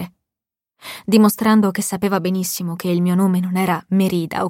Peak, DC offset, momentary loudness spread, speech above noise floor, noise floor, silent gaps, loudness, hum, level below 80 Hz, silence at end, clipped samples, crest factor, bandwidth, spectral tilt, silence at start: -2 dBFS; under 0.1%; 12 LU; 70 dB; -87 dBFS; none; -18 LUFS; none; -60 dBFS; 0 s; under 0.1%; 16 dB; 17 kHz; -6 dB/octave; 0 s